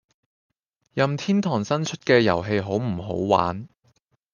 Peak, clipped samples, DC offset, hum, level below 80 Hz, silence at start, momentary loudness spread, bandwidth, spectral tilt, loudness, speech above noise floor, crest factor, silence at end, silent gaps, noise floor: -4 dBFS; under 0.1%; under 0.1%; none; -60 dBFS; 0.95 s; 9 LU; 7.4 kHz; -6 dB/octave; -23 LUFS; 43 dB; 22 dB; 0.7 s; none; -65 dBFS